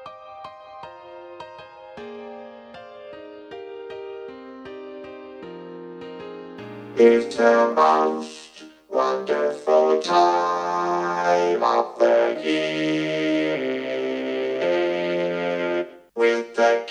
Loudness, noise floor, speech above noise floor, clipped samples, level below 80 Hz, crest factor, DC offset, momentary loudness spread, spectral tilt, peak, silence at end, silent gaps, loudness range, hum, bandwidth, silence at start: -21 LUFS; -42 dBFS; 24 dB; under 0.1%; -72 dBFS; 20 dB; under 0.1%; 22 LU; -5 dB/octave; -4 dBFS; 0 s; none; 18 LU; none; 9.8 kHz; 0 s